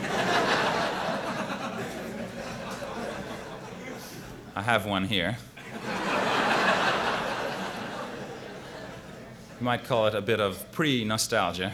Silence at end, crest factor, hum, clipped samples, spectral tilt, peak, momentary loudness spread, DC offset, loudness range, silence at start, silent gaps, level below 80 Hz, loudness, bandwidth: 0 s; 22 dB; none; under 0.1%; -4 dB/octave; -8 dBFS; 16 LU; under 0.1%; 7 LU; 0 s; none; -56 dBFS; -28 LUFS; over 20 kHz